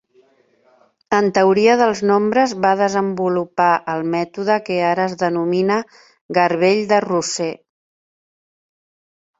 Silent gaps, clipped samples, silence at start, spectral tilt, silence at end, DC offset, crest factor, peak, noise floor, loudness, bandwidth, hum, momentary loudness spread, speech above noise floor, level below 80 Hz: 6.21-6.29 s; under 0.1%; 1.1 s; -5 dB/octave; 1.85 s; under 0.1%; 18 dB; -2 dBFS; -57 dBFS; -17 LUFS; 8 kHz; none; 8 LU; 40 dB; -62 dBFS